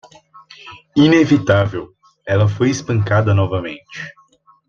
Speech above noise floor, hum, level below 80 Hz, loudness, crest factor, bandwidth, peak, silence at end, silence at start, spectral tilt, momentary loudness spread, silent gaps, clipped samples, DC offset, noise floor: 28 dB; none; -50 dBFS; -16 LUFS; 16 dB; 7.2 kHz; -2 dBFS; 0.55 s; 0.65 s; -7 dB/octave; 20 LU; none; under 0.1%; under 0.1%; -44 dBFS